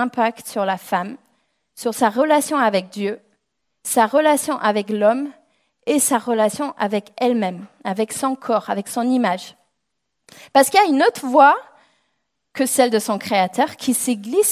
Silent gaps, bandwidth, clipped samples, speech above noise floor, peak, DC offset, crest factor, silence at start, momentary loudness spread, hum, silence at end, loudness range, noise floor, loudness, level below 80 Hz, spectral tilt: none; 16 kHz; under 0.1%; 59 dB; -2 dBFS; under 0.1%; 18 dB; 0 s; 12 LU; none; 0 s; 4 LU; -77 dBFS; -19 LUFS; -70 dBFS; -3.5 dB/octave